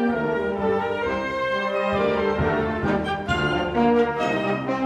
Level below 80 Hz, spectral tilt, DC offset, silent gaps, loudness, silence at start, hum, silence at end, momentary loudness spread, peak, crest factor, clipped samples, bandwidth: -44 dBFS; -6.5 dB/octave; under 0.1%; none; -23 LUFS; 0 s; none; 0 s; 4 LU; -8 dBFS; 14 dB; under 0.1%; 9.8 kHz